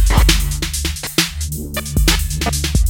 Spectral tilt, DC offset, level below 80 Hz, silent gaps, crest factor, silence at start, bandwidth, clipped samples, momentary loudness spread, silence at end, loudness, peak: -3.5 dB/octave; under 0.1%; -18 dBFS; none; 16 dB; 0 s; 17 kHz; under 0.1%; 8 LU; 0 s; -17 LUFS; 0 dBFS